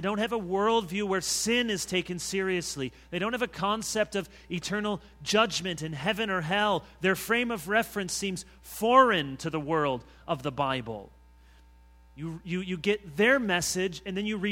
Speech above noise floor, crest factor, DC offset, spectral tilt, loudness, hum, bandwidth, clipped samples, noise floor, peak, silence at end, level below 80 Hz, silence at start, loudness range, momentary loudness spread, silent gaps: 27 dB; 22 dB; under 0.1%; -3.5 dB/octave; -28 LUFS; none; 17 kHz; under 0.1%; -56 dBFS; -6 dBFS; 0 s; -56 dBFS; 0 s; 5 LU; 11 LU; none